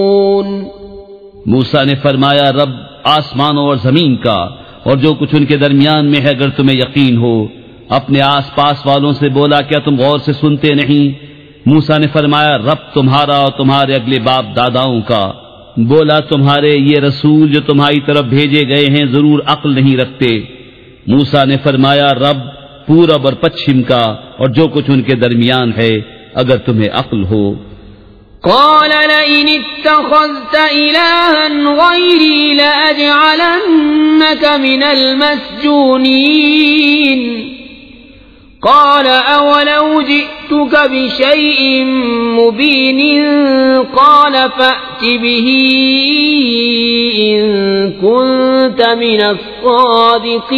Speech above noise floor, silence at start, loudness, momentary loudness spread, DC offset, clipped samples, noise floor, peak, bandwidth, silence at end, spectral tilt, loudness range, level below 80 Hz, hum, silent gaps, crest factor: 29 dB; 0 s; -9 LUFS; 7 LU; 0.2%; 0.5%; -38 dBFS; 0 dBFS; 5.4 kHz; 0 s; -8 dB/octave; 4 LU; -44 dBFS; none; none; 10 dB